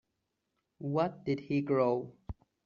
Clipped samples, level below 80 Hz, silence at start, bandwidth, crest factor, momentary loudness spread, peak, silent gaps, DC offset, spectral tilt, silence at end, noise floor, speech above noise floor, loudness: under 0.1%; -58 dBFS; 0.8 s; 7 kHz; 18 dB; 18 LU; -16 dBFS; none; under 0.1%; -7 dB/octave; 0.35 s; -83 dBFS; 52 dB; -32 LUFS